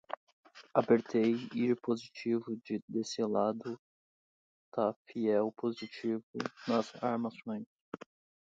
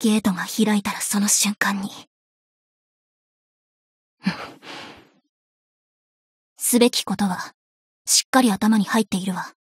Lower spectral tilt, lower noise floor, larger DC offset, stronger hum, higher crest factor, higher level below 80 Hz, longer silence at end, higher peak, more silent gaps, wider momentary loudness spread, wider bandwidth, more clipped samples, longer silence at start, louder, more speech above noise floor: first, -6 dB/octave vs -3 dB/octave; first, under -90 dBFS vs -44 dBFS; neither; neither; about the same, 22 dB vs 20 dB; second, -80 dBFS vs -64 dBFS; first, 0.5 s vs 0.1 s; second, -14 dBFS vs -4 dBFS; second, 0.17-0.43 s, 2.82-2.88 s, 3.79-4.72 s, 4.96-5.05 s, 6.23-6.34 s, 7.66-7.92 s vs 2.07-4.17 s, 5.29-6.56 s, 7.54-8.05 s, 8.25-8.33 s; second, 14 LU vs 17 LU; second, 7.8 kHz vs 16 kHz; neither; about the same, 0.1 s vs 0 s; second, -34 LUFS vs -20 LUFS; first, over 57 dB vs 23 dB